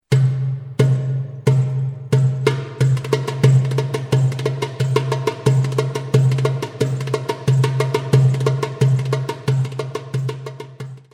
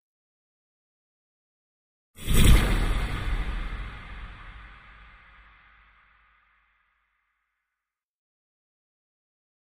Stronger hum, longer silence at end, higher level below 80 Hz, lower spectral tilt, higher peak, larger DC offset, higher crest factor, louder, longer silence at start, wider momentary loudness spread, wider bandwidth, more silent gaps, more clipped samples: neither; second, 0.15 s vs 5.05 s; second, -54 dBFS vs -30 dBFS; first, -7 dB/octave vs -4.5 dB/octave; first, 0 dBFS vs -6 dBFS; neither; second, 18 dB vs 24 dB; first, -19 LUFS vs -26 LUFS; second, 0.1 s vs 2.2 s; second, 9 LU vs 26 LU; second, 11.5 kHz vs 15.5 kHz; neither; neither